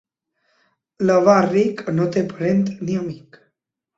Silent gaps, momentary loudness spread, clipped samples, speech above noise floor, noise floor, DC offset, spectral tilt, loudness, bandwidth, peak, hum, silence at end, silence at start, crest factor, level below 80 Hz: none; 11 LU; under 0.1%; 57 dB; -75 dBFS; under 0.1%; -7.5 dB/octave; -19 LUFS; 7.8 kHz; -2 dBFS; none; 0.8 s; 1 s; 18 dB; -60 dBFS